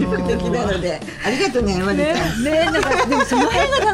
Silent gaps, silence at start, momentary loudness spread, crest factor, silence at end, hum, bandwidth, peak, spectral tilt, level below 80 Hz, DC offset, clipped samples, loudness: none; 0 s; 6 LU; 14 dB; 0 s; none; 16 kHz; -4 dBFS; -4.5 dB/octave; -34 dBFS; under 0.1%; under 0.1%; -18 LUFS